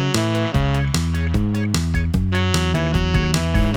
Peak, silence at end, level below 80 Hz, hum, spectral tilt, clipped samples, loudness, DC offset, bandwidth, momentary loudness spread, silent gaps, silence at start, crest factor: -4 dBFS; 0 s; -26 dBFS; none; -5.5 dB/octave; under 0.1%; -20 LUFS; 0.2%; 18.5 kHz; 2 LU; none; 0 s; 16 dB